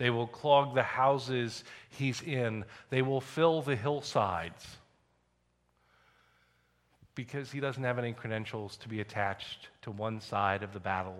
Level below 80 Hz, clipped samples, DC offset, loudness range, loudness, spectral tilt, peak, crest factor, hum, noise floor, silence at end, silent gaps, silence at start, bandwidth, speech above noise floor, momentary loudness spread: -68 dBFS; under 0.1%; under 0.1%; 10 LU; -33 LUFS; -6 dB/octave; -10 dBFS; 22 dB; 60 Hz at -65 dBFS; -74 dBFS; 0 s; none; 0 s; 13.5 kHz; 42 dB; 16 LU